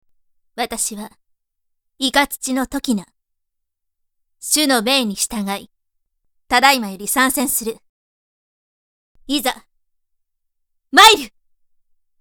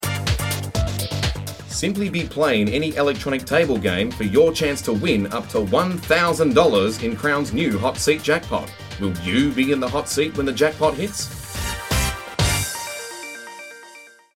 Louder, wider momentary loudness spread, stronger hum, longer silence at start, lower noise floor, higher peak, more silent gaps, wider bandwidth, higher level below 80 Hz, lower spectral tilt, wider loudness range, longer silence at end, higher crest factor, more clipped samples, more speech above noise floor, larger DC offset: first, -16 LUFS vs -21 LUFS; first, 18 LU vs 11 LU; neither; first, 0.55 s vs 0 s; first, -75 dBFS vs -45 dBFS; about the same, 0 dBFS vs -2 dBFS; first, 7.89-9.15 s vs none; first, over 20 kHz vs 17 kHz; second, -52 dBFS vs -36 dBFS; second, -1.5 dB/octave vs -4.5 dB/octave; first, 7 LU vs 4 LU; first, 0.9 s vs 0.25 s; about the same, 20 dB vs 18 dB; neither; first, 58 dB vs 25 dB; neither